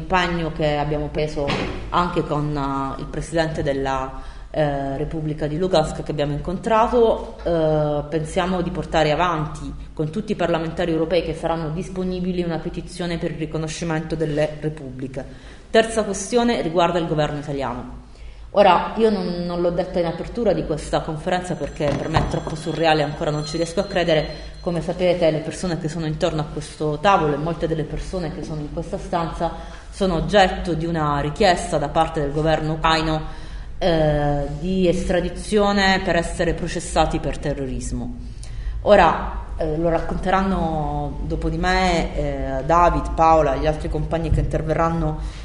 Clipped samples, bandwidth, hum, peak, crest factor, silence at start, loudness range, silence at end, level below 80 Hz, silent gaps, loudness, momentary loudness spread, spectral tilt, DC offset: under 0.1%; 11 kHz; none; -2 dBFS; 20 dB; 0 s; 4 LU; 0 s; -32 dBFS; none; -21 LUFS; 11 LU; -6 dB/octave; under 0.1%